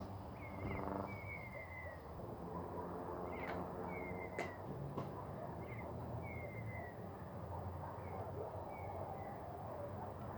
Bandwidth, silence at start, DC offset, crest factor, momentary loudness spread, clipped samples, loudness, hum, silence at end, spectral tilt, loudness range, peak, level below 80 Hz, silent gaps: over 20 kHz; 0 s; under 0.1%; 20 dB; 5 LU; under 0.1%; -47 LUFS; none; 0 s; -8 dB/octave; 2 LU; -28 dBFS; -62 dBFS; none